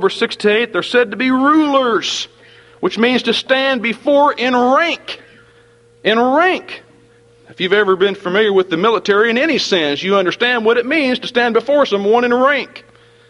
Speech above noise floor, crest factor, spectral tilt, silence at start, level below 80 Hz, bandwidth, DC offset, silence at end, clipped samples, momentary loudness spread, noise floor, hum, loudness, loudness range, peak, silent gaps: 34 dB; 16 dB; -4 dB/octave; 0 s; -60 dBFS; 11.5 kHz; under 0.1%; 0.5 s; under 0.1%; 8 LU; -48 dBFS; none; -14 LUFS; 3 LU; 0 dBFS; none